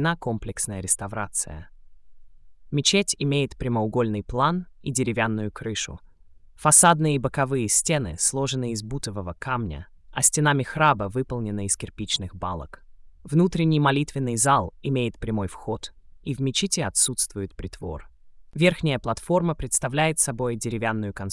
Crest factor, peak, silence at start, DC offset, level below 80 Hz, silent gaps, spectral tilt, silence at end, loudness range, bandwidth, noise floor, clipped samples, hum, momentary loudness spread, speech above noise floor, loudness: 22 dB; -2 dBFS; 0 s; under 0.1%; -46 dBFS; none; -4 dB/octave; 0 s; 5 LU; 12 kHz; -50 dBFS; under 0.1%; none; 13 LU; 26 dB; -23 LUFS